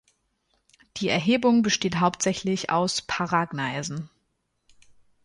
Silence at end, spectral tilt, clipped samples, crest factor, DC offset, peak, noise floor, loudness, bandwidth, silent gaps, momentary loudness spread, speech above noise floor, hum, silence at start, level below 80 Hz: 1.2 s; -4 dB/octave; under 0.1%; 18 dB; under 0.1%; -8 dBFS; -74 dBFS; -24 LUFS; 11.5 kHz; none; 12 LU; 50 dB; none; 0.95 s; -60 dBFS